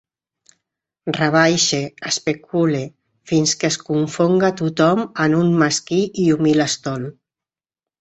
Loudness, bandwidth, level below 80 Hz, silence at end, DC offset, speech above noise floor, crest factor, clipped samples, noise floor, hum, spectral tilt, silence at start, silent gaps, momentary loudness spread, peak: -18 LUFS; 8.2 kHz; -58 dBFS; 0.9 s; under 0.1%; over 72 dB; 18 dB; under 0.1%; under -90 dBFS; none; -4.5 dB/octave; 1.05 s; none; 10 LU; 0 dBFS